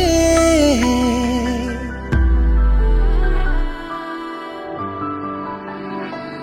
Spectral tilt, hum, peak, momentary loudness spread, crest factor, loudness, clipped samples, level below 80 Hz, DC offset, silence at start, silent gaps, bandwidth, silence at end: -5.5 dB/octave; none; -2 dBFS; 14 LU; 14 dB; -19 LUFS; under 0.1%; -20 dBFS; under 0.1%; 0 s; none; 15.5 kHz; 0 s